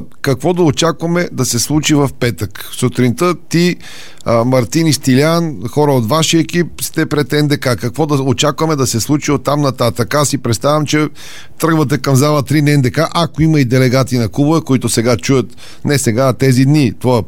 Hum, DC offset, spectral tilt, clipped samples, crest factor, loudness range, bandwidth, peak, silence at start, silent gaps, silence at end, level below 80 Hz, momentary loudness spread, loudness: none; 3%; -5.5 dB/octave; under 0.1%; 12 dB; 2 LU; 17 kHz; 0 dBFS; 0 s; none; 0.05 s; -42 dBFS; 6 LU; -13 LUFS